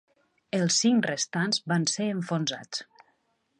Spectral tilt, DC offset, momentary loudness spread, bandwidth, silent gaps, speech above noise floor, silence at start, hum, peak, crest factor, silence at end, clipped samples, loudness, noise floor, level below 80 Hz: -3.5 dB/octave; under 0.1%; 12 LU; 11.5 kHz; none; 45 dB; 0.55 s; none; -12 dBFS; 16 dB; 0.75 s; under 0.1%; -27 LUFS; -72 dBFS; -76 dBFS